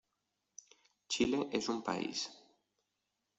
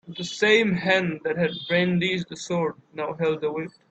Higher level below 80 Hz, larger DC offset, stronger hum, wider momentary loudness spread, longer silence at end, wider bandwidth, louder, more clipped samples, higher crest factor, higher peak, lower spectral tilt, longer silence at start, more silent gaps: second, -70 dBFS vs -64 dBFS; neither; neither; first, 23 LU vs 12 LU; first, 1 s vs 0.2 s; about the same, 8.2 kHz vs 8.4 kHz; second, -37 LUFS vs -24 LUFS; neither; about the same, 20 dB vs 18 dB; second, -20 dBFS vs -6 dBFS; second, -3.5 dB/octave vs -5 dB/octave; first, 1.1 s vs 0.05 s; neither